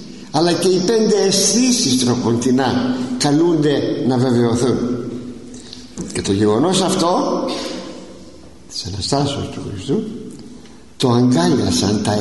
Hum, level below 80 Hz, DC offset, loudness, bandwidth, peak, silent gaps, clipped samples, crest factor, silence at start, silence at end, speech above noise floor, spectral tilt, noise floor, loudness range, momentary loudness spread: none; -48 dBFS; 0.7%; -17 LUFS; 12 kHz; -4 dBFS; none; under 0.1%; 14 dB; 0 s; 0 s; 24 dB; -4.5 dB/octave; -40 dBFS; 8 LU; 16 LU